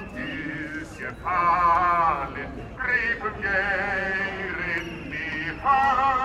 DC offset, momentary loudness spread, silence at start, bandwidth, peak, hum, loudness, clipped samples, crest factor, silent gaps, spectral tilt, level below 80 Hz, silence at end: under 0.1%; 13 LU; 0 s; 12 kHz; -10 dBFS; none; -24 LUFS; under 0.1%; 16 dB; none; -5.5 dB/octave; -46 dBFS; 0 s